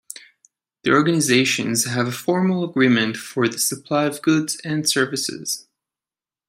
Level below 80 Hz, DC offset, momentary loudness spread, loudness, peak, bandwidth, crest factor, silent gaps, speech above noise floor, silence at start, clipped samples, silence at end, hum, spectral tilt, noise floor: -66 dBFS; under 0.1%; 10 LU; -20 LUFS; -4 dBFS; 16 kHz; 18 dB; none; over 70 dB; 0.85 s; under 0.1%; 0.9 s; none; -4 dB/octave; under -90 dBFS